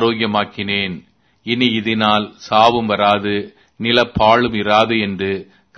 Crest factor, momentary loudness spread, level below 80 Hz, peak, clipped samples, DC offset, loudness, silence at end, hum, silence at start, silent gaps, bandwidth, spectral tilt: 16 dB; 11 LU; -46 dBFS; 0 dBFS; under 0.1%; under 0.1%; -16 LUFS; 0.35 s; none; 0 s; none; 6.6 kHz; -5.5 dB/octave